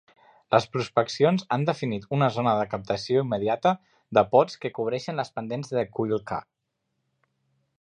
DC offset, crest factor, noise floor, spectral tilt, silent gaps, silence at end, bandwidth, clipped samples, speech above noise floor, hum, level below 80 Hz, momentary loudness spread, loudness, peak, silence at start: under 0.1%; 22 dB; -79 dBFS; -6.5 dB/octave; none; 1.4 s; 10 kHz; under 0.1%; 54 dB; none; -62 dBFS; 9 LU; -26 LUFS; -4 dBFS; 0.5 s